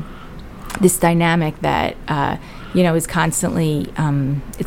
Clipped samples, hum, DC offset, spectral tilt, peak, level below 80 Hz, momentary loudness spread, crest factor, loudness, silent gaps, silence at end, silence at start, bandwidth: under 0.1%; none; under 0.1%; -5.5 dB/octave; 0 dBFS; -36 dBFS; 16 LU; 18 dB; -18 LUFS; none; 0 s; 0 s; 17 kHz